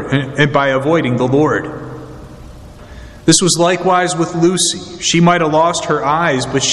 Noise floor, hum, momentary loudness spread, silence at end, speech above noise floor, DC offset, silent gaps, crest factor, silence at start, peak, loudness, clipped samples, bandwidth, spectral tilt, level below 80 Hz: -34 dBFS; none; 8 LU; 0 s; 21 dB; under 0.1%; none; 14 dB; 0 s; 0 dBFS; -13 LUFS; under 0.1%; 12.5 kHz; -4 dB/octave; -42 dBFS